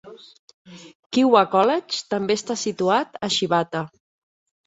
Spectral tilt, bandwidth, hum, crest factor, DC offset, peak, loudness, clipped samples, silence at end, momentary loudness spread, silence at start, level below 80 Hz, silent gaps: -4 dB/octave; 8.2 kHz; none; 20 dB; under 0.1%; -2 dBFS; -21 LUFS; under 0.1%; 0.8 s; 10 LU; 0.05 s; -66 dBFS; 0.39-0.48 s, 0.54-0.65 s, 0.95-1.10 s